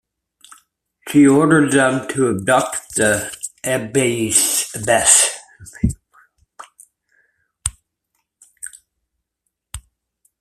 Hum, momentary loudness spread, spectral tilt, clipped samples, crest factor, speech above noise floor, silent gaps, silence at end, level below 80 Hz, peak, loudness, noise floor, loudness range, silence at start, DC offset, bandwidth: none; 23 LU; -3.5 dB/octave; under 0.1%; 20 dB; 61 dB; none; 0.6 s; -42 dBFS; 0 dBFS; -16 LUFS; -76 dBFS; 19 LU; 1.05 s; under 0.1%; 15 kHz